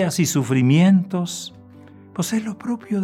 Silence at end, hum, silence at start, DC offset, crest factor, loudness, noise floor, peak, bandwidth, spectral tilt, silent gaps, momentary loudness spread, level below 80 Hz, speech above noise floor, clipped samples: 0 s; none; 0 s; under 0.1%; 14 dB; -20 LUFS; -44 dBFS; -6 dBFS; 16 kHz; -5.5 dB/octave; none; 15 LU; -68 dBFS; 25 dB; under 0.1%